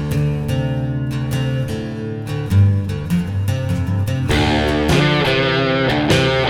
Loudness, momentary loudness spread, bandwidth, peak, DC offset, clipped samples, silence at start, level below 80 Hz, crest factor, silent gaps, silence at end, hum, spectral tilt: -18 LUFS; 7 LU; 16 kHz; -2 dBFS; under 0.1%; under 0.1%; 0 s; -32 dBFS; 16 dB; none; 0 s; none; -6 dB/octave